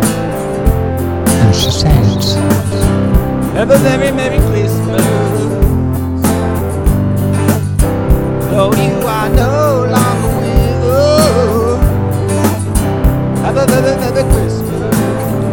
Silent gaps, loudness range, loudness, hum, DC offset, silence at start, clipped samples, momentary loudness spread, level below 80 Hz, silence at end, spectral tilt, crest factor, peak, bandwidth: none; 2 LU; -12 LUFS; none; under 0.1%; 0 s; 0.3%; 5 LU; -20 dBFS; 0 s; -6 dB/octave; 12 dB; 0 dBFS; 19.5 kHz